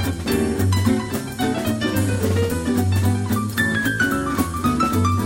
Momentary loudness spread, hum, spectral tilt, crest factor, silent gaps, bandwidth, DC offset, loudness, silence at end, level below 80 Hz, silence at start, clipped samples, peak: 3 LU; none; -5.5 dB/octave; 14 dB; none; 16.5 kHz; under 0.1%; -21 LUFS; 0 s; -38 dBFS; 0 s; under 0.1%; -6 dBFS